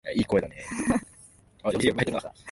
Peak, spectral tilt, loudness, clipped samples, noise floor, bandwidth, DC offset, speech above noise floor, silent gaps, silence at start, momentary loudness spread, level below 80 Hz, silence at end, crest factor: -8 dBFS; -5 dB/octave; -27 LUFS; under 0.1%; -55 dBFS; 11.5 kHz; under 0.1%; 28 dB; none; 0.05 s; 9 LU; -50 dBFS; 0 s; 20 dB